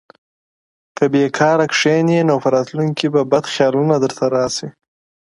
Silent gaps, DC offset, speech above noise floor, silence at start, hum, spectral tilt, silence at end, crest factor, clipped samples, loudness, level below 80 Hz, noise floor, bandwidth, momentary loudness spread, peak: none; under 0.1%; over 75 dB; 1 s; none; -5.5 dB/octave; 0.6 s; 16 dB; under 0.1%; -16 LUFS; -60 dBFS; under -90 dBFS; 11.5 kHz; 6 LU; 0 dBFS